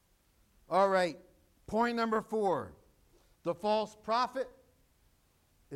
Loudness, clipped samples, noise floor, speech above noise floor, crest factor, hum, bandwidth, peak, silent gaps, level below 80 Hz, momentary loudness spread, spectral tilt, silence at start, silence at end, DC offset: -33 LUFS; under 0.1%; -70 dBFS; 38 dB; 20 dB; none; 16 kHz; -16 dBFS; none; -68 dBFS; 12 LU; -5.5 dB/octave; 0.7 s; 0 s; under 0.1%